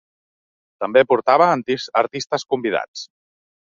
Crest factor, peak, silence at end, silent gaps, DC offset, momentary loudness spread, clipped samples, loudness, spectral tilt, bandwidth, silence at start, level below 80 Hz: 18 dB; -2 dBFS; 0.55 s; 2.88-2.94 s; under 0.1%; 15 LU; under 0.1%; -19 LUFS; -4.5 dB/octave; 7.6 kHz; 0.8 s; -66 dBFS